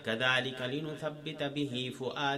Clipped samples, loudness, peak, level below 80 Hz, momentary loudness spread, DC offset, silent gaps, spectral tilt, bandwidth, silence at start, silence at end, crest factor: under 0.1%; -34 LUFS; -14 dBFS; -70 dBFS; 10 LU; under 0.1%; none; -4.5 dB/octave; 14.5 kHz; 0 s; 0 s; 20 dB